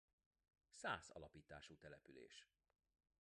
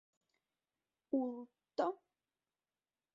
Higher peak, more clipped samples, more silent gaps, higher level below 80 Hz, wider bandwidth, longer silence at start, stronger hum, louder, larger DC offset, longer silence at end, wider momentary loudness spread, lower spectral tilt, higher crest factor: second, -32 dBFS vs -24 dBFS; neither; neither; first, -78 dBFS vs under -90 dBFS; first, 10.5 kHz vs 7.2 kHz; second, 0.75 s vs 1.1 s; neither; second, -56 LUFS vs -41 LUFS; neither; second, 0.8 s vs 1.2 s; first, 15 LU vs 12 LU; about the same, -3 dB/octave vs -4 dB/octave; about the same, 26 dB vs 22 dB